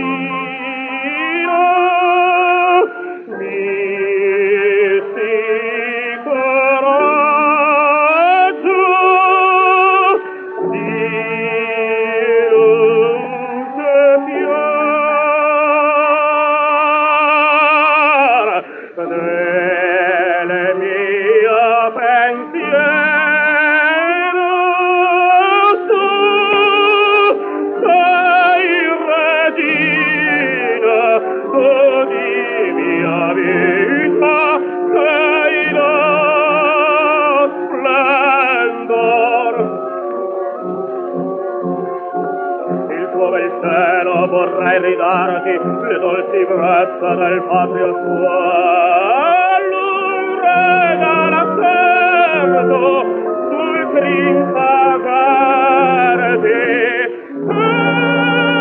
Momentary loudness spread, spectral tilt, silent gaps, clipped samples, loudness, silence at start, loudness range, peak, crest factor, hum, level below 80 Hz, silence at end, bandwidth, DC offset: 9 LU; -8.5 dB/octave; none; under 0.1%; -13 LUFS; 0 s; 4 LU; -2 dBFS; 10 dB; none; -74 dBFS; 0 s; 4.4 kHz; under 0.1%